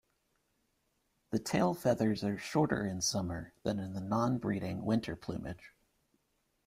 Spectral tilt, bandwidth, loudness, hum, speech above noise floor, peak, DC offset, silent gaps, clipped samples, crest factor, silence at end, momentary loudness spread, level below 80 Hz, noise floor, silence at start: -5.5 dB/octave; 16 kHz; -34 LUFS; none; 45 dB; -16 dBFS; under 0.1%; none; under 0.1%; 20 dB; 0.95 s; 10 LU; -62 dBFS; -78 dBFS; 1.3 s